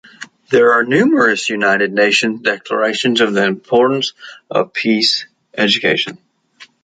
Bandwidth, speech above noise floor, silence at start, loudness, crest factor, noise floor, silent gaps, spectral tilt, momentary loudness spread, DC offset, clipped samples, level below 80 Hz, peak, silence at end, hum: 9.4 kHz; 31 dB; 0.2 s; -14 LUFS; 14 dB; -45 dBFS; none; -4 dB/octave; 8 LU; under 0.1%; under 0.1%; -62 dBFS; 0 dBFS; 0.2 s; none